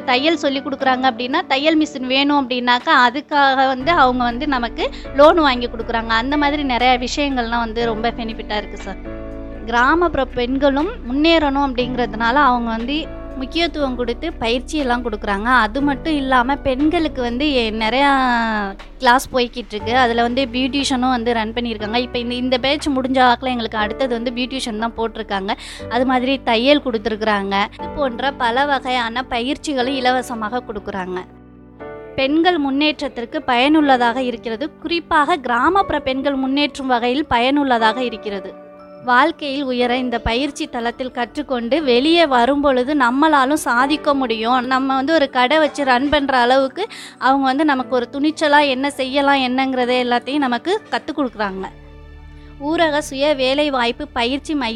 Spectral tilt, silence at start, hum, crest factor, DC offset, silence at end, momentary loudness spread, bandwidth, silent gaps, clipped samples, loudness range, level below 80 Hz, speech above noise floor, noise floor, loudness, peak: -4 dB/octave; 0 s; none; 18 dB; under 0.1%; 0 s; 10 LU; 13 kHz; none; under 0.1%; 4 LU; -38 dBFS; 21 dB; -38 dBFS; -17 LUFS; 0 dBFS